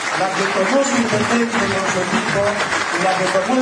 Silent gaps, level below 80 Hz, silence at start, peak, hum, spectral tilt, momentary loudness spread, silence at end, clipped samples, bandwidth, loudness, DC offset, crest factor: none; -52 dBFS; 0 s; -6 dBFS; none; -3.5 dB/octave; 2 LU; 0 s; under 0.1%; 10.5 kHz; -17 LUFS; under 0.1%; 12 dB